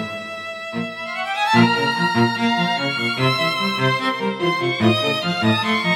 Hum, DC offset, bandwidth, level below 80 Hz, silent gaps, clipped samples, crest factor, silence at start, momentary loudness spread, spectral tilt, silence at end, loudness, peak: none; under 0.1%; 15.5 kHz; -66 dBFS; none; under 0.1%; 16 dB; 0 s; 10 LU; -5.5 dB/octave; 0 s; -19 LUFS; -4 dBFS